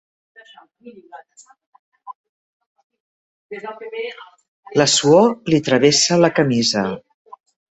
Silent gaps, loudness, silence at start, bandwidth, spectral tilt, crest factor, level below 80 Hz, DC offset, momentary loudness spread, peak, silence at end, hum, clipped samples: 1.66-1.73 s, 1.79-1.92 s, 2.15-2.60 s, 2.66-2.76 s, 2.83-2.90 s, 3.00-3.49 s, 4.48-4.63 s; -16 LUFS; 0.85 s; 8.2 kHz; -4 dB/octave; 20 dB; -60 dBFS; under 0.1%; 19 LU; 0 dBFS; 0.75 s; none; under 0.1%